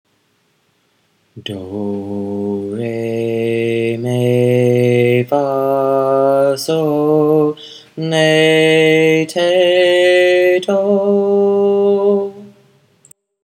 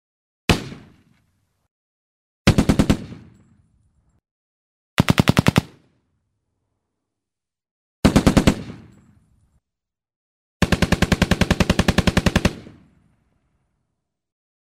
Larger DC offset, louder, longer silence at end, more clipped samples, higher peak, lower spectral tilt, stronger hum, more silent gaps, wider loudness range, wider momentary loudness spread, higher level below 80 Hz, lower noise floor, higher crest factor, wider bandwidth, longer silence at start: neither; first, -14 LUFS vs -19 LUFS; second, 0.95 s vs 2.1 s; neither; about the same, 0 dBFS vs -2 dBFS; about the same, -6 dB/octave vs -5.5 dB/octave; neither; second, none vs 1.71-2.45 s, 4.31-4.97 s, 7.71-8.03 s, 10.16-10.60 s; first, 8 LU vs 4 LU; first, 12 LU vs 9 LU; second, -68 dBFS vs -32 dBFS; second, -60 dBFS vs -87 dBFS; second, 14 dB vs 20 dB; about the same, 16 kHz vs 16 kHz; first, 1.35 s vs 0.5 s